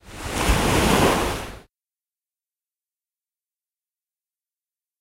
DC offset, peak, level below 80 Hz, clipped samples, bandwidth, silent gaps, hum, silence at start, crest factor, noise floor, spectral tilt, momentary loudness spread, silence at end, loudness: under 0.1%; -4 dBFS; -34 dBFS; under 0.1%; 16 kHz; none; none; 0.05 s; 22 dB; under -90 dBFS; -4 dB/octave; 13 LU; 3.4 s; -20 LUFS